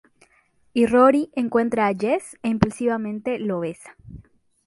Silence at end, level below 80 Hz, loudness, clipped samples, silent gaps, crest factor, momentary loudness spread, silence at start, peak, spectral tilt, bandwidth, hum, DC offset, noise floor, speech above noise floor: 0.45 s; -50 dBFS; -21 LUFS; under 0.1%; none; 22 dB; 12 LU; 0.75 s; -2 dBFS; -6.5 dB/octave; 11.5 kHz; none; under 0.1%; -61 dBFS; 40 dB